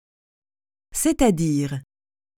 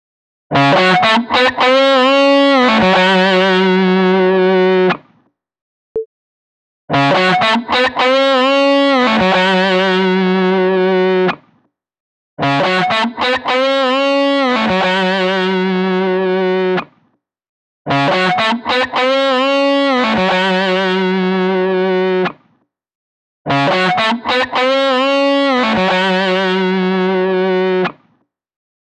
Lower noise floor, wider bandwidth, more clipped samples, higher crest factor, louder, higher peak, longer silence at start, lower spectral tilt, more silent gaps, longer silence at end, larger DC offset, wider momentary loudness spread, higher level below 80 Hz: first, under -90 dBFS vs -61 dBFS; first, 19 kHz vs 9.4 kHz; neither; first, 20 dB vs 12 dB; second, -22 LUFS vs -13 LUFS; second, -6 dBFS vs -2 dBFS; first, 0.95 s vs 0.5 s; about the same, -5.5 dB/octave vs -5.5 dB/octave; second, none vs 5.61-5.95 s, 6.06-6.88 s, 12.00-12.37 s, 17.49-17.85 s, 22.95-23.45 s; second, 0.55 s vs 1 s; neither; first, 12 LU vs 6 LU; first, -42 dBFS vs -52 dBFS